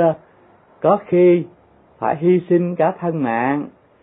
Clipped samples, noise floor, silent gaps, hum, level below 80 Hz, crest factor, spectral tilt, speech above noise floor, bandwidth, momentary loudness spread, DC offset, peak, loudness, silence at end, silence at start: under 0.1%; -51 dBFS; none; none; -62 dBFS; 14 dB; -13 dB/octave; 34 dB; 3.8 kHz; 11 LU; under 0.1%; -4 dBFS; -18 LUFS; 0.35 s; 0 s